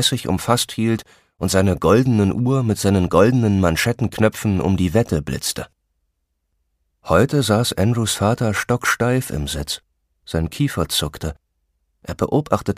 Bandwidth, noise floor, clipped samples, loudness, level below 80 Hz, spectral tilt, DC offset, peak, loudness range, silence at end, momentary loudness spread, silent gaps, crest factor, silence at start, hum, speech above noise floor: 15.5 kHz; -72 dBFS; under 0.1%; -19 LUFS; -40 dBFS; -5 dB/octave; under 0.1%; 0 dBFS; 5 LU; 0.05 s; 11 LU; none; 18 dB; 0 s; none; 53 dB